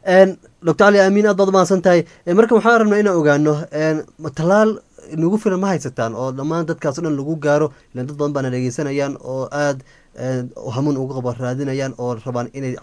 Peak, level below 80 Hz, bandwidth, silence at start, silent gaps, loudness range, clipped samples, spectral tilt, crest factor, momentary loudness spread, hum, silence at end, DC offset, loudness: 0 dBFS; -56 dBFS; 11 kHz; 0.05 s; none; 9 LU; under 0.1%; -6.5 dB/octave; 18 dB; 12 LU; none; 0.05 s; under 0.1%; -18 LUFS